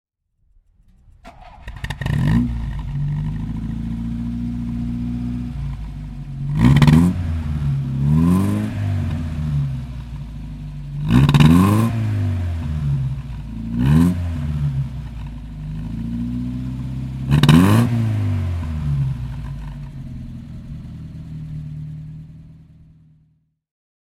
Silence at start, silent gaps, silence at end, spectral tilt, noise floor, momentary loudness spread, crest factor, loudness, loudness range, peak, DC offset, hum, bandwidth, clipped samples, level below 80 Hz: 1.25 s; none; 1.45 s; -7.5 dB/octave; -62 dBFS; 20 LU; 20 dB; -19 LUFS; 11 LU; 0 dBFS; under 0.1%; none; 15 kHz; under 0.1%; -30 dBFS